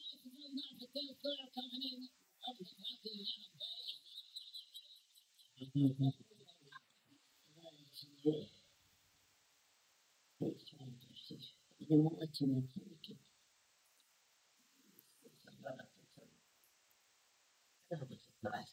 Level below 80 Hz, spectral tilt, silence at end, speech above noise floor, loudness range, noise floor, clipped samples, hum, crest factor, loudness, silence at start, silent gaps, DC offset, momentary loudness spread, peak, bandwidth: -88 dBFS; -7 dB/octave; 0 s; 37 dB; 19 LU; -74 dBFS; under 0.1%; none; 26 dB; -42 LUFS; 0 s; none; under 0.1%; 24 LU; -20 dBFS; 16 kHz